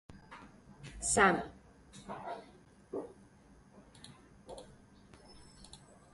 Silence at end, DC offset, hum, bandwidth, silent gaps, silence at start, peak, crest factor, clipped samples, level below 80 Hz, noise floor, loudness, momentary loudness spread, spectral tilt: 0.35 s; under 0.1%; none; 11.5 kHz; none; 0.1 s; -12 dBFS; 28 dB; under 0.1%; -60 dBFS; -61 dBFS; -33 LUFS; 29 LU; -3 dB/octave